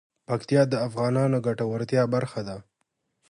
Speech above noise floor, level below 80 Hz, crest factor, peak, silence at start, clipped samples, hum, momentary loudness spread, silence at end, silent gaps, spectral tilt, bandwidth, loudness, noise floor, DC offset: 52 dB; -64 dBFS; 18 dB; -8 dBFS; 0.3 s; under 0.1%; none; 11 LU; 0.7 s; none; -7.5 dB/octave; 11.5 kHz; -25 LUFS; -77 dBFS; under 0.1%